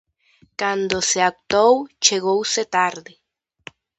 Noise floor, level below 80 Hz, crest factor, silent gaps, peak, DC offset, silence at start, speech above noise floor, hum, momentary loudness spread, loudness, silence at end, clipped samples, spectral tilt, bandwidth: -58 dBFS; -58 dBFS; 20 dB; none; 0 dBFS; under 0.1%; 0.6 s; 39 dB; none; 8 LU; -19 LUFS; 1 s; under 0.1%; -1.5 dB/octave; 8.8 kHz